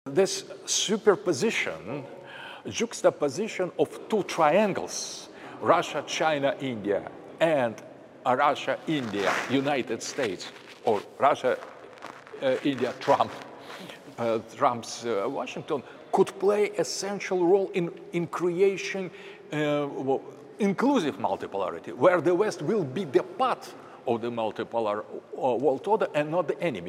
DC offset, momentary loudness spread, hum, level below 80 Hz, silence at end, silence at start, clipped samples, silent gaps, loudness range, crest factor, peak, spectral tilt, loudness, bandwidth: under 0.1%; 14 LU; none; -76 dBFS; 0 s; 0.05 s; under 0.1%; none; 3 LU; 20 dB; -6 dBFS; -4.5 dB/octave; -27 LUFS; 15.5 kHz